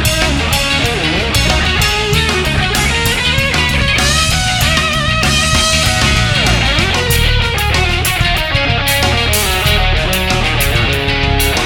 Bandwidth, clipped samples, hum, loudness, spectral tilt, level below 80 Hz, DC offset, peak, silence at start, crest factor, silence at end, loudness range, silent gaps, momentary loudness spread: 19 kHz; under 0.1%; none; -12 LUFS; -3 dB/octave; -20 dBFS; under 0.1%; 0 dBFS; 0 s; 12 dB; 0 s; 1 LU; none; 3 LU